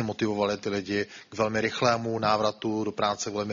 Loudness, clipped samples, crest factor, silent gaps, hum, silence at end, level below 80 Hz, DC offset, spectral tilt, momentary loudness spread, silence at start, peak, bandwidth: -28 LUFS; under 0.1%; 20 dB; none; none; 0 s; -62 dBFS; under 0.1%; -3.5 dB/octave; 6 LU; 0 s; -8 dBFS; 7.4 kHz